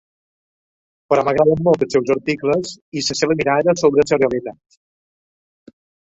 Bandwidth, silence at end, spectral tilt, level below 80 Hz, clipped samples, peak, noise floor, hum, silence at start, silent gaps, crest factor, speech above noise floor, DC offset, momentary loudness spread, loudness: 8 kHz; 1.5 s; -5 dB/octave; -52 dBFS; under 0.1%; -2 dBFS; under -90 dBFS; none; 1.1 s; 2.81-2.92 s; 18 dB; over 73 dB; under 0.1%; 8 LU; -17 LUFS